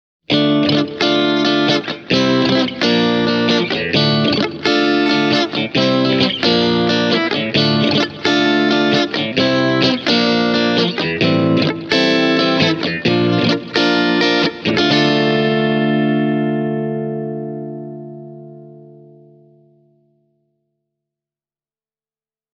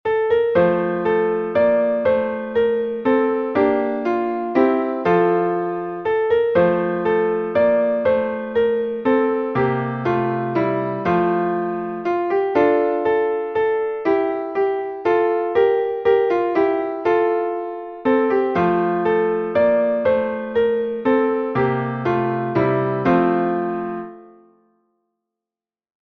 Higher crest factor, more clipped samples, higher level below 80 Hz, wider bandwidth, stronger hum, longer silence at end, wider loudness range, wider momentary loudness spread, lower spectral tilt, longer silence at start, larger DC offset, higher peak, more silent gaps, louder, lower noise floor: about the same, 16 dB vs 14 dB; neither; about the same, -54 dBFS vs -54 dBFS; first, 7.6 kHz vs 5.8 kHz; neither; first, 3.65 s vs 1.9 s; first, 6 LU vs 2 LU; about the same, 5 LU vs 5 LU; second, -5.5 dB/octave vs -9 dB/octave; first, 0.3 s vs 0.05 s; neither; first, 0 dBFS vs -4 dBFS; neither; first, -15 LUFS vs -19 LUFS; about the same, under -90 dBFS vs under -90 dBFS